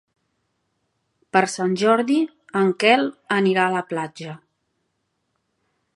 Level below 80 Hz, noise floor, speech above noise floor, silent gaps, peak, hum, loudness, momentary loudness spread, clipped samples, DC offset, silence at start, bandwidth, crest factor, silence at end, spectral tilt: -74 dBFS; -74 dBFS; 54 dB; none; 0 dBFS; none; -20 LUFS; 11 LU; under 0.1%; under 0.1%; 1.35 s; 11.5 kHz; 22 dB; 1.6 s; -5 dB/octave